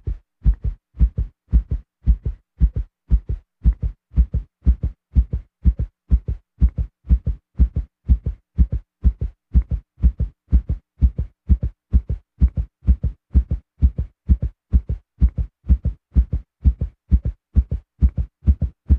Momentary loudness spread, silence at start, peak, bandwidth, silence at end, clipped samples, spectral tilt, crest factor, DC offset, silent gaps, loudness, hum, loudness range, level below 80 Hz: 8 LU; 0.05 s; -4 dBFS; 1.6 kHz; 0 s; under 0.1%; -12 dB/octave; 16 dB; under 0.1%; none; -23 LUFS; none; 1 LU; -20 dBFS